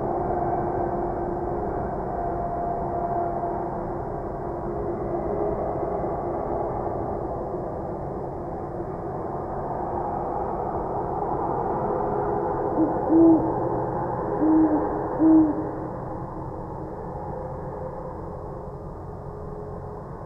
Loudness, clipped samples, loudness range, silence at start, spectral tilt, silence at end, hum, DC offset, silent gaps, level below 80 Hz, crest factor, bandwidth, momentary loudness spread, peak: -26 LUFS; under 0.1%; 11 LU; 0 s; -11.5 dB/octave; 0 s; none; under 0.1%; none; -42 dBFS; 18 dB; 2.5 kHz; 14 LU; -8 dBFS